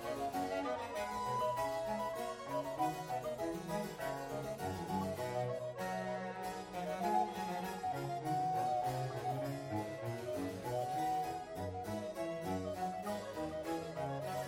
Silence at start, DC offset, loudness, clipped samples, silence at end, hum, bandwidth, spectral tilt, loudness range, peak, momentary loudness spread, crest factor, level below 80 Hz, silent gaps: 0 s; under 0.1%; -40 LUFS; under 0.1%; 0 s; none; 16.5 kHz; -5.5 dB/octave; 2 LU; -24 dBFS; 6 LU; 16 dB; -66 dBFS; none